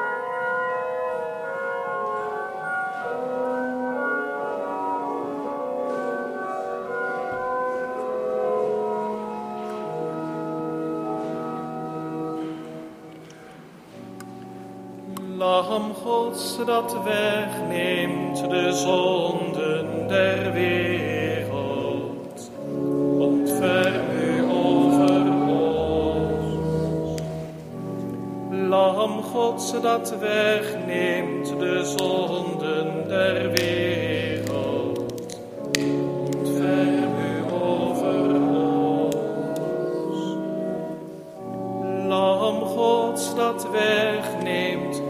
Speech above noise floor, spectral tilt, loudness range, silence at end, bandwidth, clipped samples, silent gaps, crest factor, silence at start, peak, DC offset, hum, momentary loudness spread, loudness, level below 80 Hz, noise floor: 21 dB; -5 dB/octave; 8 LU; 0 s; 15.5 kHz; under 0.1%; none; 24 dB; 0 s; 0 dBFS; under 0.1%; none; 11 LU; -24 LUFS; -54 dBFS; -44 dBFS